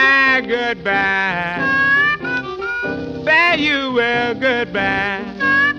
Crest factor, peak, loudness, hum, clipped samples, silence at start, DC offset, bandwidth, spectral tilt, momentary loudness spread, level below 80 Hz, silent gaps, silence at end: 14 dB; -2 dBFS; -16 LUFS; none; under 0.1%; 0 s; under 0.1%; 9.2 kHz; -5 dB/octave; 10 LU; -48 dBFS; none; 0 s